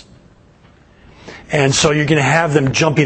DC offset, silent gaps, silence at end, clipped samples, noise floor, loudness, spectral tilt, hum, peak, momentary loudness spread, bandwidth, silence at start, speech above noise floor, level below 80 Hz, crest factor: under 0.1%; none; 0 s; under 0.1%; -47 dBFS; -14 LUFS; -4.5 dB/octave; none; 0 dBFS; 3 LU; 8.8 kHz; 1.25 s; 34 dB; -44 dBFS; 16 dB